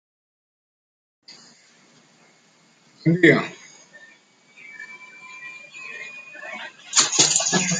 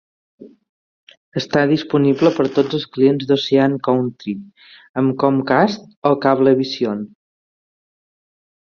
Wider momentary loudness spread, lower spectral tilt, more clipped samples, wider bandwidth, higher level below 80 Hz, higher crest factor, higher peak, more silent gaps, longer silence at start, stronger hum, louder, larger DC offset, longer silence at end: first, 23 LU vs 13 LU; second, -2.5 dB/octave vs -7 dB/octave; neither; first, 10 kHz vs 6.8 kHz; second, -66 dBFS vs -60 dBFS; first, 24 dB vs 18 dB; about the same, -2 dBFS vs -2 dBFS; second, none vs 0.69-1.07 s, 1.17-1.32 s, 4.89-4.94 s, 5.97-6.02 s; first, 1.3 s vs 0.4 s; neither; about the same, -17 LUFS vs -17 LUFS; neither; second, 0 s vs 1.55 s